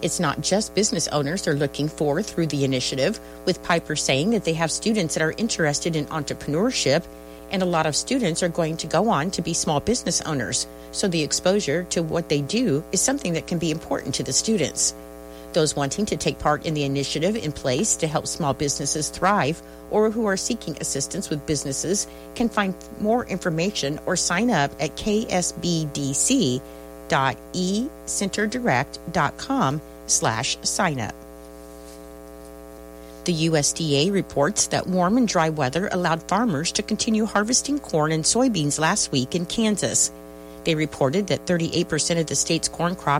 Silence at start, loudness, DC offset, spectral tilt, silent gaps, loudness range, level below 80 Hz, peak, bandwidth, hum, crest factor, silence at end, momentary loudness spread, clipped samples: 0 s; -23 LUFS; under 0.1%; -3.5 dB/octave; none; 3 LU; -48 dBFS; -6 dBFS; 16.5 kHz; none; 16 dB; 0 s; 7 LU; under 0.1%